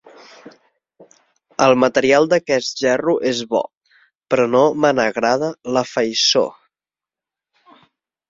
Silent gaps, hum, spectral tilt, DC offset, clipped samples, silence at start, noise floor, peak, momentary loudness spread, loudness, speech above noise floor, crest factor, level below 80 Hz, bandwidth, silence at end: 3.77-3.81 s; none; -3.5 dB/octave; under 0.1%; under 0.1%; 0.45 s; -90 dBFS; -2 dBFS; 8 LU; -17 LUFS; 74 dB; 18 dB; -60 dBFS; 7.8 kHz; 1.8 s